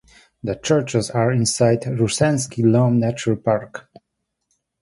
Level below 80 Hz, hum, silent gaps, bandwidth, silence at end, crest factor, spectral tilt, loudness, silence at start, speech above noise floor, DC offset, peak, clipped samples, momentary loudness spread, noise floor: -52 dBFS; none; none; 11.5 kHz; 1 s; 16 dB; -5.5 dB/octave; -19 LUFS; 0.45 s; 58 dB; under 0.1%; -4 dBFS; under 0.1%; 11 LU; -77 dBFS